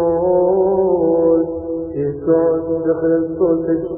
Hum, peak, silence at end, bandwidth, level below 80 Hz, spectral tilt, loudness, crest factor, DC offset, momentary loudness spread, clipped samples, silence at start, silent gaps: none; -4 dBFS; 0 s; 2.1 kHz; -44 dBFS; -14.5 dB/octave; -16 LUFS; 12 dB; under 0.1%; 7 LU; under 0.1%; 0 s; none